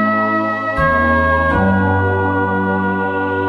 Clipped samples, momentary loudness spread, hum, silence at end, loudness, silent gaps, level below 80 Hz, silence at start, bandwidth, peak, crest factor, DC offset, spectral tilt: under 0.1%; 4 LU; none; 0 s; -15 LUFS; none; -32 dBFS; 0 s; 6 kHz; -2 dBFS; 14 dB; under 0.1%; -8.5 dB/octave